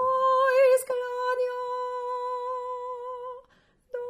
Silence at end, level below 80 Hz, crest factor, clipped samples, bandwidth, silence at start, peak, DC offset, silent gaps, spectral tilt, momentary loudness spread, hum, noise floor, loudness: 0 s; -72 dBFS; 14 dB; under 0.1%; 15 kHz; 0 s; -12 dBFS; under 0.1%; none; -1 dB/octave; 17 LU; none; -63 dBFS; -26 LUFS